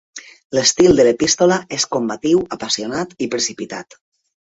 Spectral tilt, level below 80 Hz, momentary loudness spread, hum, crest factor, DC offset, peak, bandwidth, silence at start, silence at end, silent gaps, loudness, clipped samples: -3 dB/octave; -50 dBFS; 17 LU; none; 16 dB; under 0.1%; -2 dBFS; 8.2 kHz; 0.15 s; 0.7 s; 0.44-0.50 s; -16 LUFS; under 0.1%